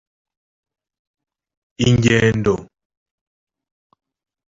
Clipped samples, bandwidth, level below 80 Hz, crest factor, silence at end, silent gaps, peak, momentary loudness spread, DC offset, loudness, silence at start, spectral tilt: under 0.1%; 7.8 kHz; -44 dBFS; 20 dB; 1.85 s; none; -2 dBFS; 7 LU; under 0.1%; -17 LUFS; 1.8 s; -6 dB/octave